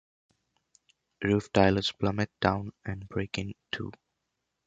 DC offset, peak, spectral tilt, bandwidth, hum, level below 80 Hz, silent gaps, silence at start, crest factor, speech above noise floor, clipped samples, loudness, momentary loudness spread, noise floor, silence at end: under 0.1%; -6 dBFS; -6 dB/octave; 9 kHz; none; -52 dBFS; none; 1.2 s; 24 dB; 53 dB; under 0.1%; -29 LUFS; 13 LU; -82 dBFS; 0.75 s